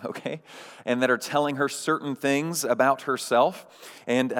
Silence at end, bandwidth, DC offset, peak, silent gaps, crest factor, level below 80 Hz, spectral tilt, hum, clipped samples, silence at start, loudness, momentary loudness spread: 0 s; 19 kHz; under 0.1%; -8 dBFS; none; 18 dB; under -90 dBFS; -4 dB/octave; none; under 0.1%; 0 s; -25 LUFS; 16 LU